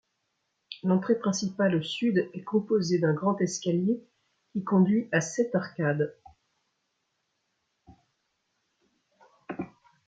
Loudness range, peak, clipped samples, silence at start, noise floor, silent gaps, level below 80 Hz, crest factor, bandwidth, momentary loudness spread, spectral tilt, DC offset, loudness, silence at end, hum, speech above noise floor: 10 LU; -10 dBFS; under 0.1%; 0.7 s; -78 dBFS; none; -72 dBFS; 18 dB; 9 kHz; 13 LU; -6 dB/octave; under 0.1%; -27 LUFS; 0.4 s; none; 52 dB